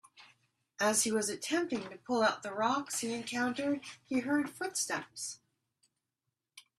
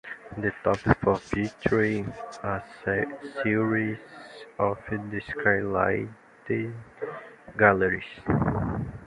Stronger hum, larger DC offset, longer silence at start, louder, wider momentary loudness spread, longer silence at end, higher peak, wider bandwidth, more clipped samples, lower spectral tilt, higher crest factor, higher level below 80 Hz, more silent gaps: neither; neither; first, 0.2 s vs 0.05 s; second, -33 LUFS vs -27 LUFS; second, 9 LU vs 15 LU; first, 0.2 s vs 0 s; second, -16 dBFS vs -2 dBFS; first, 14.5 kHz vs 11 kHz; neither; second, -2.5 dB/octave vs -8 dB/octave; about the same, 20 dB vs 24 dB; second, -78 dBFS vs -48 dBFS; neither